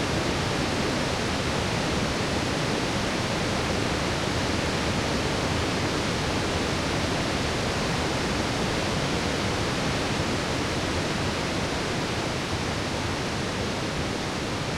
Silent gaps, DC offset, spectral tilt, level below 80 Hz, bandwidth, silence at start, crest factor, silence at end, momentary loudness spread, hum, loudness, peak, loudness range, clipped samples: none; under 0.1%; -4.5 dB/octave; -40 dBFS; 16.5 kHz; 0 s; 14 dB; 0 s; 2 LU; none; -26 LUFS; -12 dBFS; 1 LU; under 0.1%